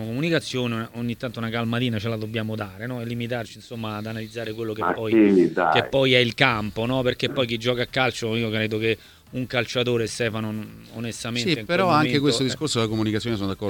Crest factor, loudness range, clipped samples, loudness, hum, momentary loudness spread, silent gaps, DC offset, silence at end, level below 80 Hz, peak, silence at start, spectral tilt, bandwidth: 22 dB; 8 LU; under 0.1%; -23 LUFS; none; 13 LU; none; under 0.1%; 0 s; -52 dBFS; -2 dBFS; 0 s; -5 dB/octave; 18.5 kHz